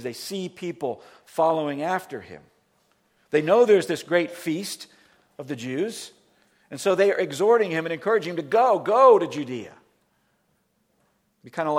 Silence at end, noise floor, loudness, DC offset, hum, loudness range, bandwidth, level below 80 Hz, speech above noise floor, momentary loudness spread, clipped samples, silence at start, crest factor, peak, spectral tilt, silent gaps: 0 s; -69 dBFS; -23 LUFS; under 0.1%; none; 7 LU; 16.5 kHz; -76 dBFS; 47 dB; 20 LU; under 0.1%; 0 s; 20 dB; -4 dBFS; -5 dB/octave; none